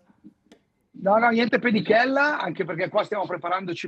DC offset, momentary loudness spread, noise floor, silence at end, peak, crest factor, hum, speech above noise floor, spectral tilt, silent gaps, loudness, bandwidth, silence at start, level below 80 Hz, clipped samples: under 0.1%; 9 LU; -59 dBFS; 0 s; -6 dBFS; 18 dB; none; 36 dB; -6.5 dB/octave; none; -22 LUFS; 8.2 kHz; 0.25 s; -76 dBFS; under 0.1%